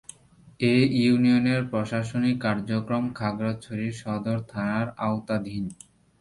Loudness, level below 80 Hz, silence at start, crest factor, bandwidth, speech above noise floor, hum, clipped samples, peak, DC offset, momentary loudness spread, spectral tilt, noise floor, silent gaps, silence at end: -26 LUFS; -58 dBFS; 0.45 s; 18 dB; 11.5 kHz; 29 dB; none; under 0.1%; -8 dBFS; under 0.1%; 11 LU; -7 dB/octave; -54 dBFS; none; 0.45 s